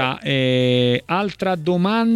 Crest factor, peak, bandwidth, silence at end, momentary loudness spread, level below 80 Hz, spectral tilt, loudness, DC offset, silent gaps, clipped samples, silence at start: 14 dB; -4 dBFS; 12.5 kHz; 0 s; 5 LU; -56 dBFS; -7 dB/octave; -19 LUFS; under 0.1%; none; under 0.1%; 0 s